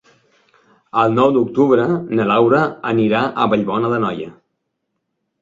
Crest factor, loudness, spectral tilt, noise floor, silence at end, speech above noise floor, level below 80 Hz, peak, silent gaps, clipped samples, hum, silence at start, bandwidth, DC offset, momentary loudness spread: 16 dB; -16 LUFS; -8 dB/octave; -74 dBFS; 1.1 s; 58 dB; -56 dBFS; -2 dBFS; none; under 0.1%; none; 0.95 s; 7.6 kHz; under 0.1%; 7 LU